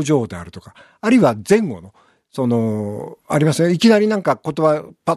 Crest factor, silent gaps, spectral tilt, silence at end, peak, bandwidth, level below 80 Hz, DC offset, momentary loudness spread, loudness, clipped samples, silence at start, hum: 16 dB; none; -6 dB/octave; 0 s; -2 dBFS; 13.5 kHz; -58 dBFS; under 0.1%; 17 LU; -17 LUFS; under 0.1%; 0 s; none